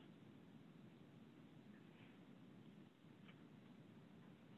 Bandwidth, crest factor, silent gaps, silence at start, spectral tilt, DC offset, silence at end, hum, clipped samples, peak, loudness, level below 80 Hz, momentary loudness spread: 8 kHz; 14 dB; none; 0 s; -6 dB/octave; under 0.1%; 0 s; none; under 0.1%; -48 dBFS; -64 LUFS; under -90 dBFS; 1 LU